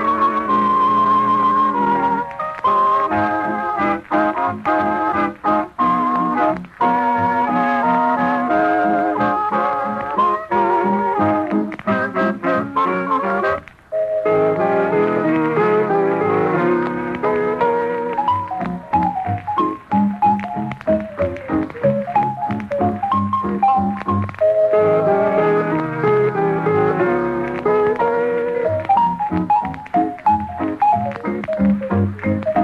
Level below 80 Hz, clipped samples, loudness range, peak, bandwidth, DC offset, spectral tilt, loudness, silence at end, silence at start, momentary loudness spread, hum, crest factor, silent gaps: -50 dBFS; under 0.1%; 3 LU; -6 dBFS; 8.6 kHz; under 0.1%; -8.5 dB/octave; -18 LUFS; 0 s; 0 s; 6 LU; none; 12 dB; none